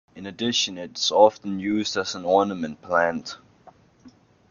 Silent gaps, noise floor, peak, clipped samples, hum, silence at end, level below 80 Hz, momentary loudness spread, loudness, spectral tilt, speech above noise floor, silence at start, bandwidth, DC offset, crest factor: none; -53 dBFS; -2 dBFS; under 0.1%; none; 0.4 s; -66 dBFS; 15 LU; -23 LUFS; -3.5 dB/octave; 30 dB; 0.15 s; 7.2 kHz; under 0.1%; 22 dB